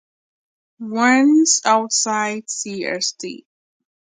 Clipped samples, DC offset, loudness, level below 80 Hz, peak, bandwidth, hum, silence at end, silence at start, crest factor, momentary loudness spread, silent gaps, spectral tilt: under 0.1%; under 0.1%; -17 LUFS; -74 dBFS; -2 dBFS; 9.6 kHz; none; 0.75 s; 0.8 s; 18 dB; 16 LU; none; -1.5 dB/octave